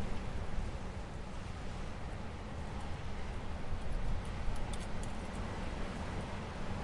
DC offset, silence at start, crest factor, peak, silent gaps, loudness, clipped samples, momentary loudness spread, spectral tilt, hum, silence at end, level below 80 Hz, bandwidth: under 0.1%; 0 s; 16 dB; -22 dBFS; none; -43 LUFS; under 0.1%; 3 LU; -6 dB/octave; none; 0 s; -42 dBFS; 11.5 kHz